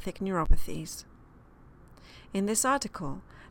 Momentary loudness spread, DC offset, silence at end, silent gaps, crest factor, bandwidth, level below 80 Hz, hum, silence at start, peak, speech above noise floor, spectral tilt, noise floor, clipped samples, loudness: 18 LU; under 0.1%; 0.1 s; none; 20 dB; 17.5 kHz; -34 dBFS; none; 0 s; -8 dBFS; 28 dB; -4 dB/octave; -55 dBFS; under 0.1%; -31 LUFS